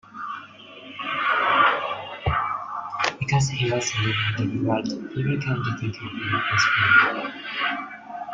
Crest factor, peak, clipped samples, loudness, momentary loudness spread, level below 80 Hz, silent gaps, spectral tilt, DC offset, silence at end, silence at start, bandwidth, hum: 20 dB; -4 dBFS; under 0.1%; -23 LUFS; 16 LU; -50 dBFS; none; -4.5 dB/octave; under 0.1%; 0 s; 0.1 s; 9.2 kHz; none